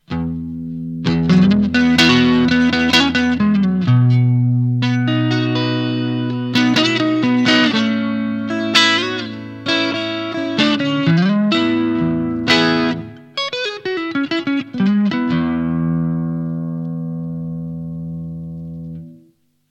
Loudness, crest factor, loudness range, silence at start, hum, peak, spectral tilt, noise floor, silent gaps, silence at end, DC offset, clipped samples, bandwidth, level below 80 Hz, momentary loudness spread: -16 LUFS; 16 dB; 7 LU; 0.1 s; none; 0 dBFS; -5.5 dB/octave; -55 dBFS; none; 0.55 s; under 0.1%; under 0.1%; 11.5 kHz; -48 dBFS; 14 LU